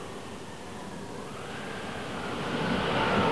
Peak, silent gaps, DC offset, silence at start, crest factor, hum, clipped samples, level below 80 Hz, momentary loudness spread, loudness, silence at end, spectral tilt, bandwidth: -14 dBFS; none; 0.4%; 0 s; 18 dB; none; under 0.1%; -54 dBFS; 14 LU; -33 LUFS; 0 s; -5 dB/octave; 11 kHz